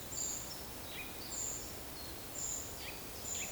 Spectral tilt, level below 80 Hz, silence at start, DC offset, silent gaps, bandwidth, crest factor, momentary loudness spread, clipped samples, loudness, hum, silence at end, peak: -1.5 dB/octave; -58 dBFS; 0 s; under 0.1%; none; over 20 kHz; 16 dB; 5 LU; under 0.1%; -41 LUFS; none; 0 s; -28 dBFS